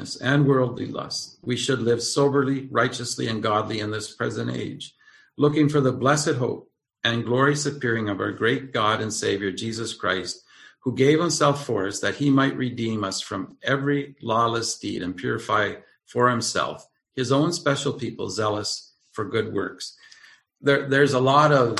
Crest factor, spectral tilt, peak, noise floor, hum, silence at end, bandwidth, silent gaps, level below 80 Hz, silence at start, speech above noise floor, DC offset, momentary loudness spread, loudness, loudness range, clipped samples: 20 dB; -4.5 dB/octave; -4 dBFS; -52 dBFS; none; 0 s; 12.5 kHz; none; -60 dBFS; 0 s; 29 dB; under 0.1%; 11 LU; -23 LUFS; 3 LU; under 0.1%